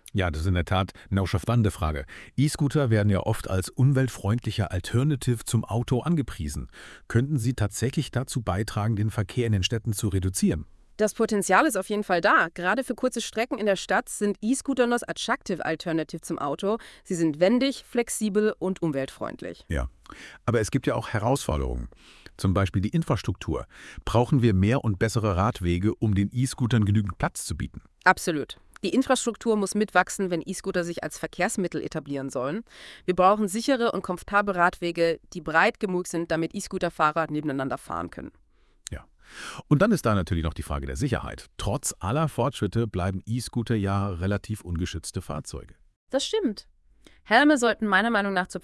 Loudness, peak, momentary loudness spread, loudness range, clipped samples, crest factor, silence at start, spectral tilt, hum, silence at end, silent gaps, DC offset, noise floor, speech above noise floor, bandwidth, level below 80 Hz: -26 LUFS; -4 dBFS; 12 LU; 4 LU; under 0.1%; 22 dB; 0.15 s; -5.5 dB/octave; none; 0.05 s; 45.96-46.07 s; under 0.1%; -56 dBFS; 31 dB; 12 kHz; -44 dBFS